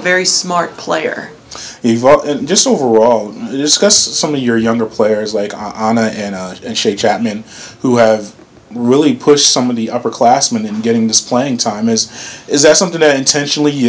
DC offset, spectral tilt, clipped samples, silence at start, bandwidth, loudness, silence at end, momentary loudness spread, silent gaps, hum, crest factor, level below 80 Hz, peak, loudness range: under 0.1%; -3 dB/octave; 0.6%; 0 s; 8 kHz; -12 LUFS; 0 s; 12 LU; none; none; 12 dB; -52 dBFS; 0 dBFS; 4 LU